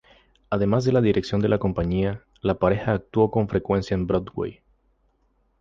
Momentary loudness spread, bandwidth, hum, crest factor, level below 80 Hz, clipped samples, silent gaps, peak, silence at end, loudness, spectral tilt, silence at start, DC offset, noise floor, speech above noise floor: 8 LU; 7.6 kHz; none; 18 dB; -42 dBFS; under 0.1%; none; -6 dBFS; 1.1 s; -24 LUFS; -8 dB/octave; 0.5 s; under 0.1%; -66 dBFS; 44 dB